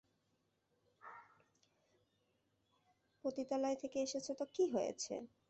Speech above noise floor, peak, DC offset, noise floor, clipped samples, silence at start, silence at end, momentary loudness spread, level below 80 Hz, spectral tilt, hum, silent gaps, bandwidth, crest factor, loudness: 42 dB; -26 dBFS; under 0.1%; -82 dBFS; under 0.1%; 1.05 s; 0.25 s; 20 LU; -84 dBFS; -3.5 dB/octave; none; none; 8.2 kHz; 18 dB; -41 LUFS